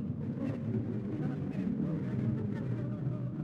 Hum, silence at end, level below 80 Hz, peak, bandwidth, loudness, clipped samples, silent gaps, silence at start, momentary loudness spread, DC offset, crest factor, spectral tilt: none; 0 s; -58 dBFS; -20 dBFS; 5.6 kHz; -35 LUFS; under 0.1%; none; 0 s; 3 LU; under 0.1%; 14 dB; -10.5 dB/octave